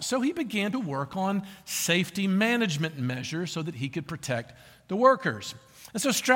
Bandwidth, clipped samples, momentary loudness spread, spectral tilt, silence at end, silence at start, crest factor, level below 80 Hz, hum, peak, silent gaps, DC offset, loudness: 17 kHz; under 0.1%; 12 LU; -4 dB/octave; 0 s; 0 s; 20 dB; -66 dBFS; none; -8 dBFS; none; under 0.1%; -28 LUFS